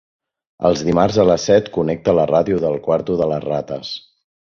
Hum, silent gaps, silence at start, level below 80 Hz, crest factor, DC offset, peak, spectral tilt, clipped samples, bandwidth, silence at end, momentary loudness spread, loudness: none; none; 0.6 s; -46 dBFS; 16 dB; under 0.1%; -2 dBFS; -6 dB/octave; under 0.1%; 7.2 kHz; 0.5 s; 10 LU; -17 LUFS